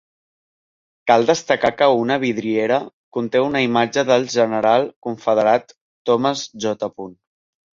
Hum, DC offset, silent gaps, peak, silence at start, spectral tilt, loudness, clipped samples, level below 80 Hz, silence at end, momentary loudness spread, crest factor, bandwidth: none; under 0.1%; 2.93-3.12 s, 4.96-5.02 s, 5.81-6.05 s; -2 dBFS; 1.05 s; -4.5 dB/octave; -19 LUFS; under 0.1%; -60 dBFS; 0.6 s; 11 LU; 18 dB; 7.6 kHz